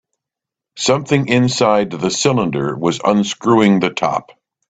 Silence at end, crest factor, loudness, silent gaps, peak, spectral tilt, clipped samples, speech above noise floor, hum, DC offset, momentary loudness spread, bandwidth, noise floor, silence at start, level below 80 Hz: 0.5 s; 16 dB; -16 LUFS; none; 0 dBFS; -5 dB/octave; under 0.1%; 70 dB; none; under 0.1%; 6 LU; 9.2 kHz; -85 dBFS; 0.75 s; -52 dBFS